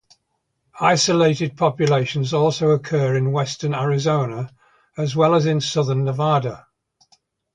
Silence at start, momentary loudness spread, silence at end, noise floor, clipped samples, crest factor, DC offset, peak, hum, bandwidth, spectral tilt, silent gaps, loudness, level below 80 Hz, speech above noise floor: 0.75 s; 9 LU; 0.95 s; -73 dBFS; under 0.1%; 18 dB; under 0.1%; -2 dBFS; none; 9.4 kHz; -5.5 dB/octave; none; -19 LUFS; -58 dBFS; 54 dB